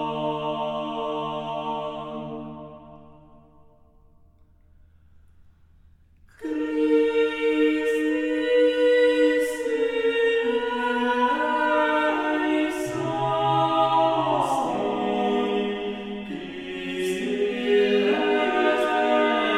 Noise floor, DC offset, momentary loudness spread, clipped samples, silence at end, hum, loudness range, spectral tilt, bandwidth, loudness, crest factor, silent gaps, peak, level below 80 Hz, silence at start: -55 dBFS; under 0.1%; 12 LU; under 0.1%; 0 s; none; 12 LU; -5 dB/octave; 13.5 kHz; -23 LUFS; 14 dB; none; -10 dBFS; -58 dBFS; 0 s